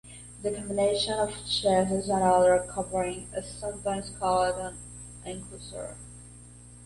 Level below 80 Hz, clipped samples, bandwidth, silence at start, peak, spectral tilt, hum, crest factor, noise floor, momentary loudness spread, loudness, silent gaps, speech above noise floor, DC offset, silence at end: -50 dBFS; under 0.1%; 11.5 kHz; 0.05 s; -12 dBFS; -4 dB/octave; 60 Hz at -45 dBFS; 18 dB; -49 dBFS; 20 LU; -27 LUFS; none; 21 dB; under 0.1%; 0 s